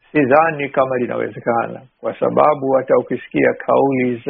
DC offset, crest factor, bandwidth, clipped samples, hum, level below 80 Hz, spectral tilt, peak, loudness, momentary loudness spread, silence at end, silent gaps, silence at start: under 0.1%; 16 dB; 4.5 kHz; under 0.1%; none; -58 dBFS; -6 dB/octave; 0 dBFS; -17 LUFS; 8 LU; 0 s; none; 0.15 s